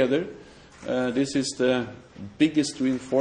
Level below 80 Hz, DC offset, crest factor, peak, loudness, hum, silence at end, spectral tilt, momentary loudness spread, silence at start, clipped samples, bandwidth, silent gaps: -60 dBFS; under 0.1%; 16 dB; -8 dBFS; -25 LUFS; none; 0 s; -5 dB/octave; 18 LU; 0 s; under 0.1%; 10.5 kHz; none